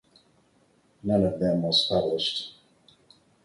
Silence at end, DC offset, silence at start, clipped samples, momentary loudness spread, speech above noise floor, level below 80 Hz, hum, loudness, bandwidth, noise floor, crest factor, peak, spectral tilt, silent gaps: 0.95 s; under 0.1%; 1.05 s; under 0.1%; 12 LU; 39 dB; -56 dBFS; none; -25 LUFS; 11.5 kHz; -64 dBFS; 18 dB; -10 dBFS; -6 dB/octave; none